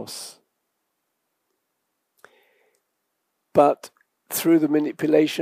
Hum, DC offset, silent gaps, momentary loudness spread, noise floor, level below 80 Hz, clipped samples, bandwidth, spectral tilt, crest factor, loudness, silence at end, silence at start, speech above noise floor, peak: none; under 0.1%; none; 16 LU; -77 dBFS; -74 dBFS; under 0.1%; 15.5 kHz; -5 dB/octave; 22 dB; -21 LUFS; 0 s; 0 s; 57 dB; -4 dBFS